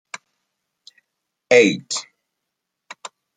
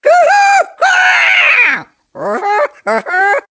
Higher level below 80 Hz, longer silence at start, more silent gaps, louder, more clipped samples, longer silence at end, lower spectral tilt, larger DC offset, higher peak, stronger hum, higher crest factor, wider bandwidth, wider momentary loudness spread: second, -72 dBFS vs -64 dBFS; first, 1.5 s vs 0.05 s; neither; second, -17 LUFS vs -9 LUFS; neither; first, 0.3 s vs 0.1 s; first, -3.5 dB/octave vs -1 dB/octave; neither; about the same, -2 dBFS vs 0 dBFS; neither; first, 22 dB vs 10 dB; first, 9.6 kHz vs 8 kHz; first, 24 LU vs 11 LU